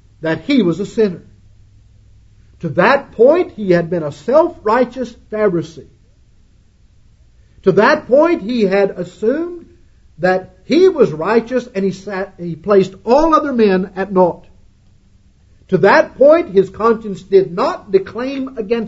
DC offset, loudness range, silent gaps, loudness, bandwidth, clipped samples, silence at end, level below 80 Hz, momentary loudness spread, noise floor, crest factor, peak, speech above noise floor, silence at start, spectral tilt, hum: under 0.1%; 4 LU; none; -15 LUFS; 8 kHz; under 0.1%; 0 s; -44 dBFS; 12 LU; -49 dBFS; 16 dB; 0 dBFS; 35 dB; 0.2 s; -7 dB/octave; none